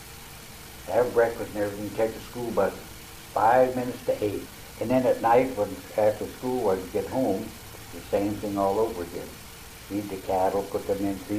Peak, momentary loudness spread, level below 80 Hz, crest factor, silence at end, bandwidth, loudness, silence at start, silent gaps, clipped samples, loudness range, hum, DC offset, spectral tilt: -10 dBFS; 19 LU; -52 dBFS; 18 dB; 0 s; 15.5 kHz; -27 LUFS; 0 s; none; under 0.1%; 4 LU; none; under 0.1%; -5.5 dB/octave